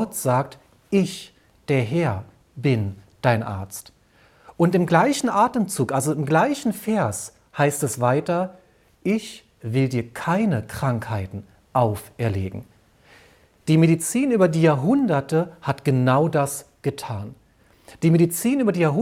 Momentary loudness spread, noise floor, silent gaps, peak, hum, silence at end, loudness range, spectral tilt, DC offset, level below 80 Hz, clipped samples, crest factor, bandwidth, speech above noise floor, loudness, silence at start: 14 LU; -56 dBFS; none; -4 dBFS; none; 0 s; 5 LU; -6 dB/octave; under 0.1%; -58 dBFS; under 0.1%; 18 dB; 16.5 kHz; 35 dB; -22 LUFS; 0 s